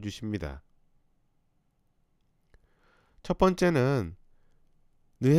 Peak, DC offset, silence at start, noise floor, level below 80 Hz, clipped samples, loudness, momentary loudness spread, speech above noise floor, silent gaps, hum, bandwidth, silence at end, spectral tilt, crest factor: -8 dBFS; under 0.1%; 0 s; -71 dBFS; -50 dBFS; under 0.1%; -28 LUFS; 19 LU; 44 dB; none; none; 14.5 kHz; 0 s; -7 dB/octave; 22 dB